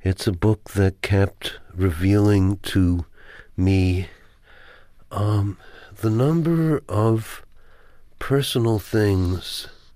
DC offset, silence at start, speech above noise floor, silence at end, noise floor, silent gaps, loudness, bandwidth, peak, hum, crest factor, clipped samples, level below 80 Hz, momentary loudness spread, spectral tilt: under 0.1%; 0.05 s; 28 dB; 0.25 s; -48 dBFS; none; -22 LUFS; 15.5 kHz; -8 dBFS; none; 14 dB; under 0.1%; -42 dBFS; 13 LU; -7 dB/octave